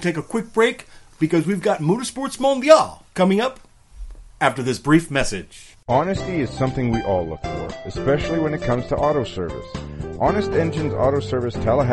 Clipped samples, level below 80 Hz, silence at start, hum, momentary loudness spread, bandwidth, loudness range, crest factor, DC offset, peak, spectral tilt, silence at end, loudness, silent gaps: under 0.1%; -40 dBFS; 0 s; none; 11 LU; 11.5 kHz; 4 LU; 20 dB; under 0.1%; 0 dBFS; -6 dB/octave; 0 s; -21 LUFS; none